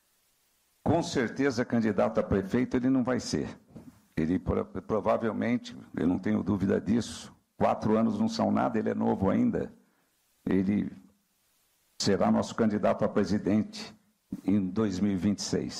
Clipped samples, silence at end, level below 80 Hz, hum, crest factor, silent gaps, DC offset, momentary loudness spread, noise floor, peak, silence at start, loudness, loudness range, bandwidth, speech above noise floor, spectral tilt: under 0.1%; 0 s; -54 dBFS; none; 14 dB; none; under 0.1%; 11 LU; -71 dBFS; -14 dBFS; 0.85 s; -29 LUFS; 2 LU; 11.5 kHz; 43 dB; -6 dB/octave